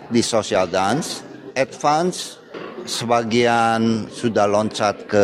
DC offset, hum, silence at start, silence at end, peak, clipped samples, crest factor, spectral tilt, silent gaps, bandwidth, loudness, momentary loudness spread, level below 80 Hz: under 0.1%; none; 0 s; 0 s; -4 dBFS; under 0.1%; 16 dB; -4.5 dB/octave; none; 15 kHz; -20 LUFS; 13 LU; -58 dBFS